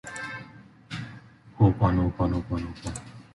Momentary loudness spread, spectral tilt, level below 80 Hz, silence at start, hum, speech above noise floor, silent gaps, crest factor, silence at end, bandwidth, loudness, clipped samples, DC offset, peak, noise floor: 18 LU; -7.5 dB/octave; -40 dBFS; 0.05 s; none; 24 dB; none; 20 dB; 0.1 s; 11.5 kHz; -27 LUFS; under 0.1%; under 0.1%; -8 dBFS; -48 dBFS